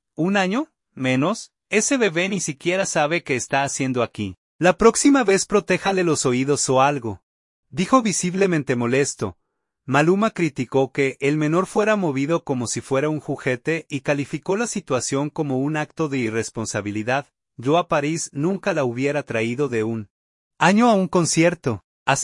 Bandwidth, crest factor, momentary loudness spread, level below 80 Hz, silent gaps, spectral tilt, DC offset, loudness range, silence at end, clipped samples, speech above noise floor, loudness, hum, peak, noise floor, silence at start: 11.5 kHz; 20 dB; 9 LU; -56 dBFS; 4.37-4.59 s, 7.23-7.63 s, 20.10-20.51 s, 21.84-22.06 s; -4.5 dB/octave; under 0.1%; 5 LU; 0 s; under 0.1%; 40 dB; -21 LUFS; none; -2 dBFS; -60 dBFS; 0.2 s